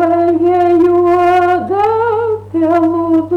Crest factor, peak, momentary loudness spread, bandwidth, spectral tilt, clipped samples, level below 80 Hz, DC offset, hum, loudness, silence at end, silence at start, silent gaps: 6 dB; -4 dBFS; 5 LU; 6 kHz; -8 dB/octave; under 0.1%; -48 dBFS; under 0.1%; 50 Hz at -35 dBFS; -12 LUFS; 0 s; 0 s; none